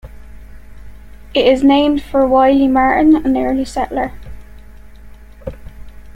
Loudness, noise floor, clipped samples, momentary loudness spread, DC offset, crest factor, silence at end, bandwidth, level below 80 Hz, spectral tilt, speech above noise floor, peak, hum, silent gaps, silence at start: -13 LUFS; -36 dBFS; under 0.1%; 18 LU; under 0.1%; 14 dB; 0.05 s; 11.5 kHz; -36 dBFS; -6 dB/octave; 24 dB; -2 dBFS; none; none; 0.05 s